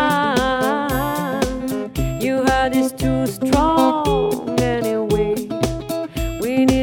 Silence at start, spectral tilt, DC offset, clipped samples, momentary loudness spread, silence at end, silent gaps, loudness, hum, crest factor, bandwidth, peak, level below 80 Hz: 0 s; -5.5 dB/octave; under 0.1%; under 0.1%; 8 LU; 0 s; none; -19 LUFS; none; 16 dB; 19 kHz; -2 dBFS; -32 dBFS